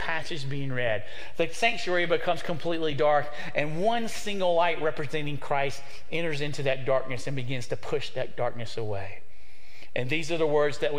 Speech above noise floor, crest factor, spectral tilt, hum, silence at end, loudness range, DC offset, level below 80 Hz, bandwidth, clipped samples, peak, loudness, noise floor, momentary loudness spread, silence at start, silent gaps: 26 dB; 20 dB; -5 dB/octave; none; 0 s; 5 LU; 4%; -56 dBFS; 16 kHz; under 0.1%; -8 dBFS; -29 LUFS; -54 dBFS; 9 LU; 0 s; none